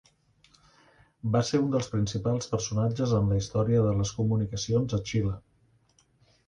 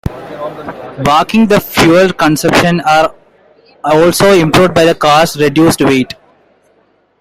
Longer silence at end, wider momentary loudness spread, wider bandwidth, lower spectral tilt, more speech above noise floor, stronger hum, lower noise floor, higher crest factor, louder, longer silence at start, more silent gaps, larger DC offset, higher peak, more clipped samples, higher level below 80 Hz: about the same, 1.1 s vs 1.1 s; second, 5 LU vs 16 LU; second, 9.6 kHz vs 16.5 kHz; first, -6.5 dB/octave vs -5 dB/octave; second, 39 dB vs 44 dB; neither; first, -66 dBFS vs -53 dBFS; first, 16 dB vs 10 dB; second, -28 LUFS vs -9 LUFS; first, 1.25 s vs 0.05 s; neither; neither; second, -12 dBFS vs 0 dBFS; neither; second, -48 dBFS vs -38 dBFS